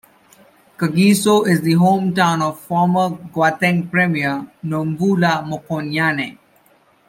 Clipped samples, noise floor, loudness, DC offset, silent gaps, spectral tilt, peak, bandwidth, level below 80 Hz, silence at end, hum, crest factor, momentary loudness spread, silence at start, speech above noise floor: under 0.1%; -55 dBFS; -17 LUFS; under 0.1%; none; -6 dB/octave; -2 dBFS; 16.5 kHz; -60 dBFS; 0.75 s; none; 16 dB; 10 LU; 0.8 s; 38 dB